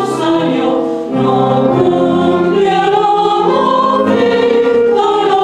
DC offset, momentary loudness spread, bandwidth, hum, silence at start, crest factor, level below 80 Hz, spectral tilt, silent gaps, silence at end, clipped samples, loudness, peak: under 0.1%; 3 LU; 11 kHz; none; 0 s; 10 dB; -50 dBFS; -6.5 dB/octave; none; 0 s; under 0.1%; -11 LUFS; 0 dBFS